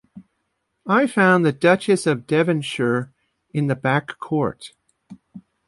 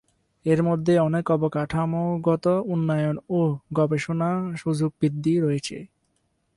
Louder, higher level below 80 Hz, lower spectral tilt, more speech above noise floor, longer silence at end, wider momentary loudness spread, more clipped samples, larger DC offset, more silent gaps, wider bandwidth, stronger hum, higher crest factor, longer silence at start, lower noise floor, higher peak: first, -20 LUFS vs -24 LUFS; second, -62 dBFS vs -56 dBFS; second, -6 dB/octave vs -7.5 dB/octave; first, 54 dB vs 48 dB; second, 0.3 s vs 0.7 s; first, 13 LU vs 5 LU; neither; neither; neither; about the same, 11.5 kHz vs 11.5 kHz; neither; about the same, 18 dB vs 14 dB; second, 0.15 s vs 0.45 s; about the same, -73 dBFS vs -71 dBFS; first, -4 dBFS vs -8 dBFS